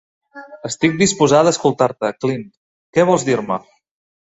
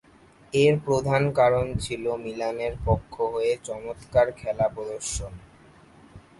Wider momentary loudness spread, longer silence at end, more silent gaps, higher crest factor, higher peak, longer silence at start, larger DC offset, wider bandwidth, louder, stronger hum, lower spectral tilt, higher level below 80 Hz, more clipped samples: first, 13 LU vs 10 LU; first, 0.75 s vs 0.2 s; first, 2.57-2.93 s vs none; about the same, 16 dB vs 18 dB; first, -2 dBFS vs -8 dBFS; second, 0.35 s vs 0.55 s; neither; second, 8.2 kHz vs 11.5 kHz; first, -17 LUFS vs -25 LUFS; neither; about the same, -4.5 dB/octave vs -5.5 dB/octave; second, -56 dBFS vs -44 dBFS; neither